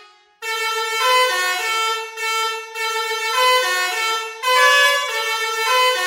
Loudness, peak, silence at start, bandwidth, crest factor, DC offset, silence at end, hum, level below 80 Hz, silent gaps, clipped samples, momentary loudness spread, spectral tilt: -17 LUFS; -2 dBFS; 0 s; 16.5 kHz; 18 dB; under 0.1%; 0 s; none; -86 dBFS; none; under 0.1%; 9 LU; 4.5 dB/octave